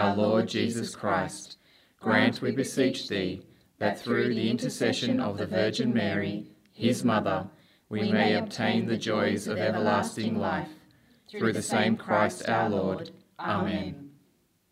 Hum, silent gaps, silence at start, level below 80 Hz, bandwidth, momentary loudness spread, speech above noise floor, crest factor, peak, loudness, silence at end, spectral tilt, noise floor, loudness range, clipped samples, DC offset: none; none; 0 s; -68 dBFS; 15 kHz; 12 LU; 40 dB; 20 dB; -8 dBFS; -28 LUFS; 0.6 s; -5 dB/octave; -67 dBFS; 1 LU; under 0.1%; under 0.1%